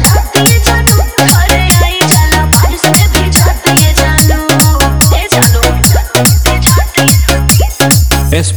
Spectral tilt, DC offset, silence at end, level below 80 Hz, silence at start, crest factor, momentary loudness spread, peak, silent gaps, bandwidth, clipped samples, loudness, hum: -3.5 dB/octave; 1%; 0 s; -14 dBFS; 0 s; 8 dB; 1 LU; 0 dBFS; none; over 20 kHz; 2%; -7 LUFS; none